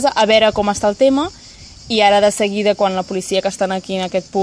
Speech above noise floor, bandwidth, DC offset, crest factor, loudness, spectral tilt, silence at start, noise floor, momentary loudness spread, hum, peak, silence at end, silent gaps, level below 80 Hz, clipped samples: 23 dB; 11 kHz; under 0.1%; 16 dB; -16 LUFS; -4 dB/octave; 0 s; -39 dBFS; 8 LU; none; 0 dBFS; 0 s; none; -46 dBFS; under 0.1%